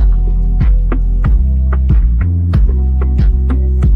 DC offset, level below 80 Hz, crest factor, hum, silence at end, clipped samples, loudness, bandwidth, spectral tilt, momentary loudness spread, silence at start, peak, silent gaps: under 0.1%; -10 dBFS; 8 dB; none; 0 s; under 0.1%; -14 LUFS; 3 kHz; -10.5 dB/octave; 3 LU; 0 s; -2 dBFS; none